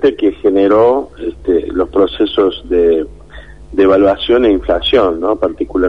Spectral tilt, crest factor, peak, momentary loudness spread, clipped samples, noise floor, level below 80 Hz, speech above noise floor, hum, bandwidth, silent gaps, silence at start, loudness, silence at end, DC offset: -7 dB/octave; 12 dB; -2 dBFS; 8 LU; under 0.1%; -34 dBFS; -34 dBFS; 23 dB; none; 5.8 kHz; none; 0 s; -13 LUFS; 0 s; 0.7%